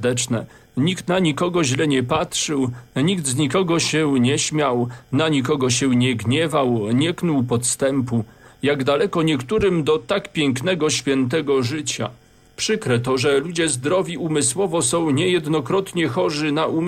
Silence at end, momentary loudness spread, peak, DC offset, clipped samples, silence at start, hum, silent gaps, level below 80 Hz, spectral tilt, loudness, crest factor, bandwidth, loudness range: 0 s; 5 LU; -6 dBFS; under 0.1%; under 0.1%; 0 s; none; none; -52 dBFS; -4.5 dB/octave; -20 LUFS; 14 dB; 15.5 kHz; 2 LU